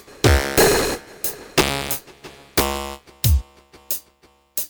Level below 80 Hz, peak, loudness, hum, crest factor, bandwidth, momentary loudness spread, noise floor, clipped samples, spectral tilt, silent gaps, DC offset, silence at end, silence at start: -28 dBFS; -2 dBFS; -20 LUFS; none; 18 dB; over 20 kHz; 11 LU; -56 dBFS; under 0.1%; -4 dB/octave; none; under 0.1%; 0.05 s; 0.1 s